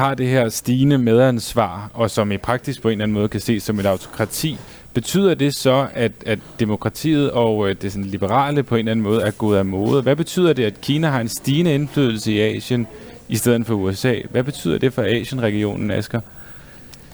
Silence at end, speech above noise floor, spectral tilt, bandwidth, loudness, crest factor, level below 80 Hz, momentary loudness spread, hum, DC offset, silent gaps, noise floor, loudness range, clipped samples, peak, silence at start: 0 s; 22 dB; -6 dB/octave; over 20 kHz; -19 LUFS; 16 dB; -48 dBFS; 8 LU; none; under 0.1%; none; -41 dBFS; 3 LU; under 0.1%; -4 dBFS; 0 s